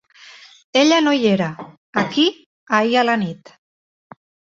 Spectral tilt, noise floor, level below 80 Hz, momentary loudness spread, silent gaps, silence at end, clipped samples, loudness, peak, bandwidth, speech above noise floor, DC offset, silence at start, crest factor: -4.5 dB/octave; -44 dBFS; -64 dBFS; 12 LU; 1.77-1.93 s, 2.46-2.67 s; 1.25 s; under 0.1%; -18 LUFS; -2 dBFS; 7.6 kHz; 27 dB; under 0.1%; 0.75 s; 18 dB